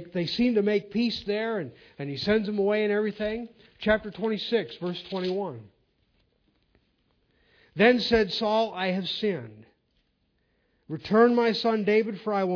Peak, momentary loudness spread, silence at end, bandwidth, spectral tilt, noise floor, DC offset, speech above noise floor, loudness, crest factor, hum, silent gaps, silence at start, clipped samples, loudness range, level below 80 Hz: -6 dBFS; 15 LU; 0 s; 5.4 kHz; -6.5 dB/octave; -72 dBFS; under 0.1%; 46 dB; -26 LUFS; 22 dB; none; none; 0 s; under 0.1%; 4 LU; -56 dBFS